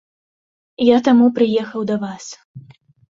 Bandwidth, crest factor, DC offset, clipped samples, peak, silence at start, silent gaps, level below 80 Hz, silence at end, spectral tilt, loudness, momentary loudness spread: 7.6 kHz; 16 dB; under 0.1%; under 0.1%; -2 dBFS; 0.8 s; 2.45-2.54 s; -62 dBFS; 0.55 s; -6 dB/octave; -16 LUFS; 21 LU